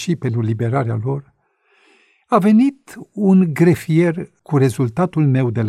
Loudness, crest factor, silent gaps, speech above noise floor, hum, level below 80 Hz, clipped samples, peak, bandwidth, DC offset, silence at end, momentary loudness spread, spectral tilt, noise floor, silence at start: -17 LUFS; 16 dB; none; 44 dB; none; -56 dBFS; under 0.1%; -2 dBFS; 14.5 kHz; under 0.1%; 0 s; 10 LU; -8 dB/octave; -60 dBFS; 0 s